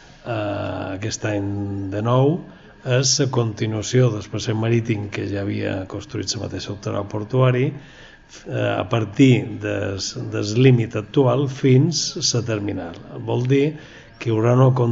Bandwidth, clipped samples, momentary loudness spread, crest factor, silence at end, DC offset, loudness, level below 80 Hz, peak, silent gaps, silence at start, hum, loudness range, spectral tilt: 8 kHz; under 0.1%; 13 LU; 18 dB; 0 s; under 0.1%; -21 LUFS; -52 dBFS; -2 dBFS; none; 0.25 s; none; 5 LU; -5.5 dB/octave